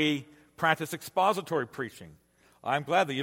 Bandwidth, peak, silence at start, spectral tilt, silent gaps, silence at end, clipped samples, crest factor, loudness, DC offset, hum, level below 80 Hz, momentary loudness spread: 16.5 kHz; -8 dBFS; 0 s; -4.5 dB/octave; none; 0 s; under 0.1%; 22 dB; -30 LUFS; under 0.1%; none; -72 dBFS; 12 LU